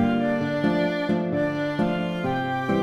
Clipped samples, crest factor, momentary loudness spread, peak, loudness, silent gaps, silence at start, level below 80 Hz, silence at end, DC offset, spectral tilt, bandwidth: under 0.1%; 12 dB; 3 LU; -10 dBFS; -24 LUFS; none; 0 s; -54 dBFS; 0 s; under 0.1%; -7.5 dB/octave; 12 kHz